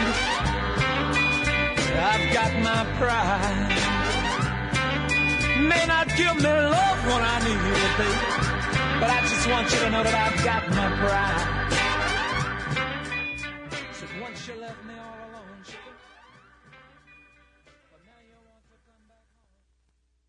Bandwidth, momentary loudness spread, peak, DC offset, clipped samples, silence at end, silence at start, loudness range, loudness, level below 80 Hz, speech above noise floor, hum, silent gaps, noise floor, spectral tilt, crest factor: 11 kHz; 15 LU; -10 dBFS; under 0.1%; under 0.1%; 4.35 s; 0 s; 13 LU; -23 LUFS; -38 dBFS; 46 dB; none; none; -69 dBFS; -4 dB/octave; 16 dB